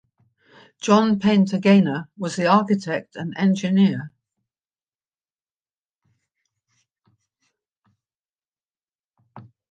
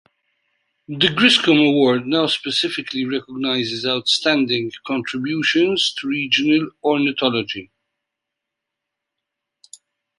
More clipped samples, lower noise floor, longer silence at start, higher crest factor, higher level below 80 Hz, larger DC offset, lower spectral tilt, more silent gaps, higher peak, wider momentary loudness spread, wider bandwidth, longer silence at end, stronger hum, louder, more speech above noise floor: neither; first, under -90 dBFS vs -82 dBFS; about the same, 0.85 s vs 0.9 s; about the same, 20 dB vs 20 dB; about the same, -68 dBFS vs -64 dBFS; neither; first, -6.5 dB/octave vs -4 dB/octave; first, 4.88-4.99 s, 5.42-5.66 s, 5.73-6.01 s, 7.77-7.82 s, 8.15-8.34 s, 8.48-8.52 s, 8.65-8.69 s, 8.95-8.99 s vs none; second, -4 dBFS vs 0 dBFS; first, 13 LU vs 10 LU; second, 9 kHz vs 11.5 kHz; second, 0.3 s vs 2.55 s; neither; about the same, -20 LUFS vs -18 LUFS; first, over 71 dB vs 63 dB